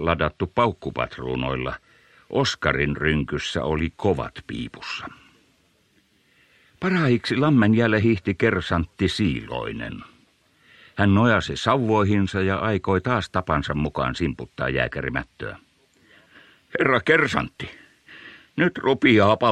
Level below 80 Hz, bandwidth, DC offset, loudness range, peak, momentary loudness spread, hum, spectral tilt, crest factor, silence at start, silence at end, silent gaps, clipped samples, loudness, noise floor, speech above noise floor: -44 dBFS; 10.5 kHz; under 0.1%; 6 LU; -2 dBFS; 15 LU; none; -6.5 dB/octave; 20 dB; 0 s; 0 s; none; under 0.1%; -22 LUFS; -63 dBFS; 41 dB